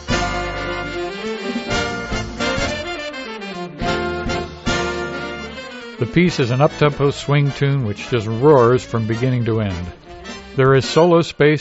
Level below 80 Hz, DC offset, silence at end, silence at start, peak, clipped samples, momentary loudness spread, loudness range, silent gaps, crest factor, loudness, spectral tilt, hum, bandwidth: -36 dBFS; under 0.1%; 0 s; 0 s; -2 dBFS; under 0.1%; 15 LU; 7 LU; none; 16 dB; -19 LUFS; -5 dB/octave; none; 8 kHz